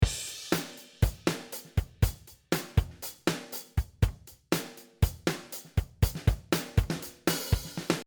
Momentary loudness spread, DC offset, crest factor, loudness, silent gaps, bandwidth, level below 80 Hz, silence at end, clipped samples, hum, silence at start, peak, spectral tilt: 7 LU; under 0.1%; 20 dB; -32 LUFS; none; over 20 kHz; -36 dBFS; 0.05 s; under 0.1%; none; 0 s; -10 dBFS; -5 dB/octave